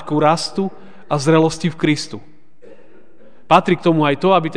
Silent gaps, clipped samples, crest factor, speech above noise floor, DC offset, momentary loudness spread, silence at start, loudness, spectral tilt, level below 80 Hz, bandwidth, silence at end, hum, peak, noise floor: none; under 0.1%; 18 dB; 34 dB; 2%; 10 LU; 0 s; -16 LUFS; -6 dB/octave; -54 dBFS; 10 kHz; 0 s; none; 0 dBFS; -50 dBFS